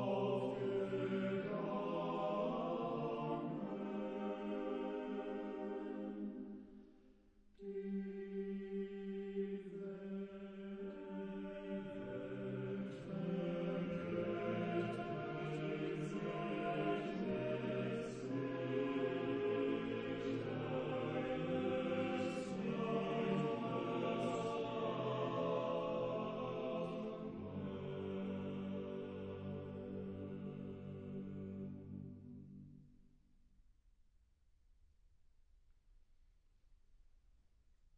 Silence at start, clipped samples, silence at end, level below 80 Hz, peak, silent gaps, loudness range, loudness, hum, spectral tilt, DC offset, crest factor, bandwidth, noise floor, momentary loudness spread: 0 s; under 0.1%; 0.8 s; -70 dBFS; -26 dBFS; none; 8 LU; -43 LUFS; none; -7.5 dB/octave; under 0.1%; 18 dB; 9.4 kHz; -72 dBFS; 9 LU